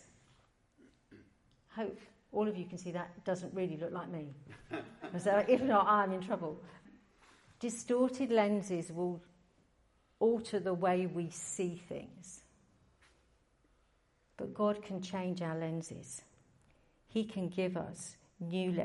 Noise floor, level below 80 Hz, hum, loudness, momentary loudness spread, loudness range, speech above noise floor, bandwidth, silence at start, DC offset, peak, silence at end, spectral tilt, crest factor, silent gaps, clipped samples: -73 dBFS; -74 dBFS; none; -36 LUFS; 18 LU; 9 LU; 38 dB; 11.5 kHz; 1.1 s; under 0.1%; -16 dBFS; 0 s; -5.5 dB/octave; 20 dB; none; under 0.1%